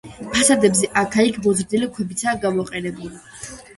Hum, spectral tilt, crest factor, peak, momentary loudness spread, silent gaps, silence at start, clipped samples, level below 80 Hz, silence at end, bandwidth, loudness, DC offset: none; -3.5 dB/octave; 18 dB; -2 dBFS; 20 LU; none; 0.05 s; under 0.1%; -50 dBFS; 0.05 s; 12 kHz; -19 LUFS; under 0.1%